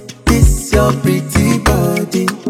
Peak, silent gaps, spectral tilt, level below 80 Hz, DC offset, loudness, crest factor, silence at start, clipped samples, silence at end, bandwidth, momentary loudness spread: 0 dBFS; none; -5.5 dB/octave; -20 dBFS; under 0.1%; -13 LUFS; 12 dB; 0 s; under 0.1%; 0 s; 16.5 kHz; 4 LU